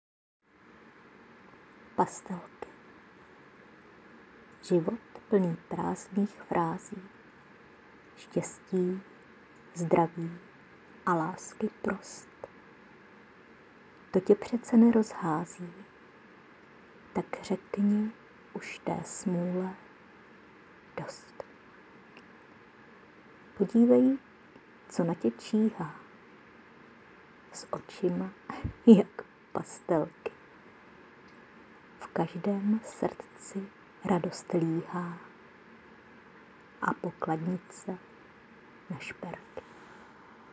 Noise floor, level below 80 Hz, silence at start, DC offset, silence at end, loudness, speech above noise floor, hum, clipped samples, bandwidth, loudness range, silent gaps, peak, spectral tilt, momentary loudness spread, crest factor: -57 dBFS; -66 dBFS; 2 s; under 0.1%; 0.5 s; -31 LUFS; 28 dB; none; under 0.1%; 8 kHz; 10 LU; none; -6 dBFS; -7 dB/octave; 22 LU; 28 dB